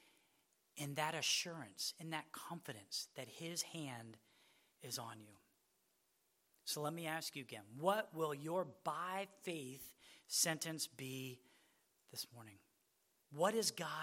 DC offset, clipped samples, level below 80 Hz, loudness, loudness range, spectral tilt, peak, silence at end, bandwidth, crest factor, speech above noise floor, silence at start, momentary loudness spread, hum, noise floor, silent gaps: under 0.1%; under 0.1%; under -90 dBFS; -43 LUFS; 7 LU; -2.5 dB/octave; -22 dBFS; 0 s; 16.5 kHz; 24 dB; 37 dB; 0.75 s; 17 LU; none; -81 dBFS; none